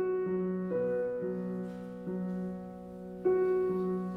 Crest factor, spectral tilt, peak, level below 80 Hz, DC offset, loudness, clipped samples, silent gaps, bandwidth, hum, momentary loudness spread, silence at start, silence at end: 14 dB; -10.5 dB/octave; -20 dBFS; -66 dBFS; under 0.1%; -33 LUFS; under 0.1%; none; 3.9 kHz; none; 13 LU; 0 s; 0 s